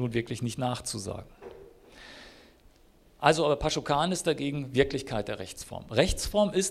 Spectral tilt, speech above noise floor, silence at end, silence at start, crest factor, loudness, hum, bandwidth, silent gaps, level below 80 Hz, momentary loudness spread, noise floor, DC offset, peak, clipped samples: -4.5 dB/octave; 31 dB; 0 s; 0 s; 26 dB; -29 LUFS; none; 15.5 kHz; none; -46 dBFS; 21 LU; -59 dBFS; under 0.1%; -4 dBFS; under 0.1%